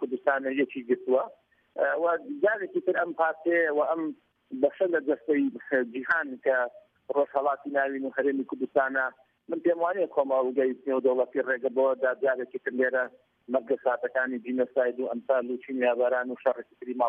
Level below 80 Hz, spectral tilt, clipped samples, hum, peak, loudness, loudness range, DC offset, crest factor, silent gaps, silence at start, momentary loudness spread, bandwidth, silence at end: -82 dBFS; -8 dB/octave; under 0.1%; none; -10 dBFS; -28 LUFS; 2 LU; under 0.1%; 16 dB; none; 0 s; 6 LU; 3.7 kHz; 0 s